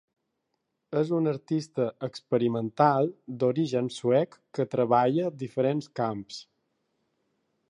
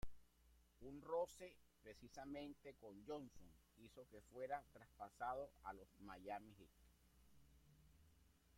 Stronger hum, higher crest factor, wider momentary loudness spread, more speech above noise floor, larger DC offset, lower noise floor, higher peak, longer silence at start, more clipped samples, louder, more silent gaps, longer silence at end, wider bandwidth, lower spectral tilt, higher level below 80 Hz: neither; about the same, 20 dB vs 20 dB; second, 9 LU vs 16 LU; first, 53 dB vs 21 dB; neither; first, -80 dBFS vs -75 dBFS; first, -8 dBFS vs -34 dBFS; first, 0.9 s vs 0 s; neither; first, -27 LUFS vs -54 LUFS; neither; first, 1.3 s vs 0 s; second, 10.5 kHz vs 16.5 kHz; first, -7.5 dB/octave vs -5.5 dB/octave; about the same, -74 dBFS vs -72 dBFS